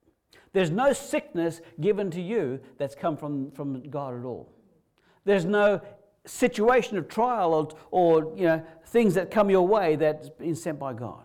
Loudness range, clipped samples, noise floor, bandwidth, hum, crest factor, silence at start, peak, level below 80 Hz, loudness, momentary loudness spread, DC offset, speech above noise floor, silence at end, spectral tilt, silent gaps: 7 LU; under 0.1%; -65 dBFS; 16 kHz; none; 14 dB; 0.55 s; -12 dBFS; -60 dBFS; -26 LUFS; 12 LU; under 0.1%; 39 dB; 0.05 s; -6 dB/octave; none